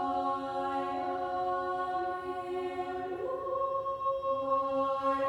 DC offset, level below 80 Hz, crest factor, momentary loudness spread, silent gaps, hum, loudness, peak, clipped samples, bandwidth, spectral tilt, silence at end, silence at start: under 0.1%; -64 dBFS; 14 dB; 6 LU; none; none; -33 LUFS; -20 dBFS; under 0.1%; 11 kHz; -6 dB/octave; 0 s; 0 s